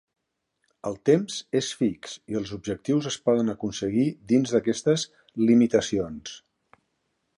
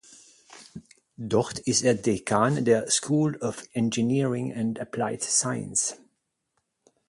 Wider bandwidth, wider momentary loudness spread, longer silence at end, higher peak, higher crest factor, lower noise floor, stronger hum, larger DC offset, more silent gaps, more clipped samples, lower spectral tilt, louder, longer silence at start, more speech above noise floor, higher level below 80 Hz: about the same, 11 kHz vs 11.5 kHz; first, 13 LU vs 8 LU; second, 1 s vs 1.15 s; about the same, -8 dBFS vs -8 dBFS; about the same, 18 dB vs 20 dB; about the same, -77 dBFS vs -77 dBFS; neither; neither; neither; neither; first, -5.5 dB/octave vs -4 dB/octave; about the same, -25 LUFS vs -25 LUFS; first, 0.85 s vs 0.1 s; about the same, 52 dB vs 52 dB; about the same, -60 dBFS vs -62 dBFS